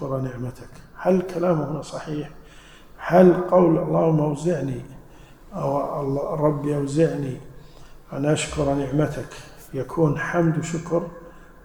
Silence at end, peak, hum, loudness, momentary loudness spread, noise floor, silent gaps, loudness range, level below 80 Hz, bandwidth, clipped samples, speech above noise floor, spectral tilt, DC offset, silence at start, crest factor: 0.2 s; -2 dBFS; none; -22 LUFS; 17 LU; -46 dBFS; none; 5 LU; -46 dBFS; 19.5 kHz; under 0.1%; 24 dB; -7 dB/octave; under 0.1%; 0 s; 20 dB